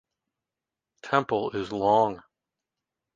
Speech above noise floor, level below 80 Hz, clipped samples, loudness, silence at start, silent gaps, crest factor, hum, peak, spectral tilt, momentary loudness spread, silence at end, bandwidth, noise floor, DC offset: 64 dB; -64 dBFS; under 0.1%; -26 LUFS; 1.05 s; none; 22 dB; none; -6 dBFS; -6.5 dB/octave; 16 LU; 0.95 s; 7.6 kHz; -89 dBFS; under 0.1%